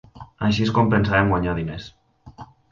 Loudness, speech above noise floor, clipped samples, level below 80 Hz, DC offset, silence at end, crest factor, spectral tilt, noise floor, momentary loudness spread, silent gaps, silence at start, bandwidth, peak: -21 LUFS; 24 dB; under 0.1%; -40 dBFS; under 0.1%; 0.25 s; 18 dB; -7 dB/octave; -43 dBFS; 15 LU; none; 0.15 s; 7.4 kHz; -4 dBFS